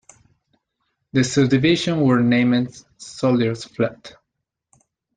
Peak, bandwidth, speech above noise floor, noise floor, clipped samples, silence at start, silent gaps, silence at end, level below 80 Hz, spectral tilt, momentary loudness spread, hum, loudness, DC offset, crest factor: -4 dBFS; 9.4 kHz; 61 dB; -80 dBFS; under 0.1%; 1.15 s; none; 1.1 s; -56 dBFS; -6 dB/octave; 8 LU; none; -19 LUFS; under 0.1%; 18 dB